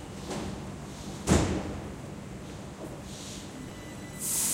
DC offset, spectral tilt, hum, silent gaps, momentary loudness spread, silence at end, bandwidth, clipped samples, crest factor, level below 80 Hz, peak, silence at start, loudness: under 0.1%; -4 dB/octave; none; none; 15 LU; 0 s; 16 kHz; under 0.1%; 24 dB; -44 dBFS; -10 dBFS; 0 s; -34 LUFS